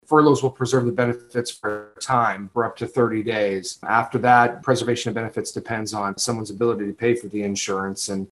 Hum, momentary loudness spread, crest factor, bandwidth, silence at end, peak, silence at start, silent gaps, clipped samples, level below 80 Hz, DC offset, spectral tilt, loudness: none; 11 LU; 20 dB; 12.5 kHz; 0.05 s; -2 dBFS; 0.1 s; none; under 0.1%; -62 dBFS; under 0.1%; -5 dB/octave; -22 LUFS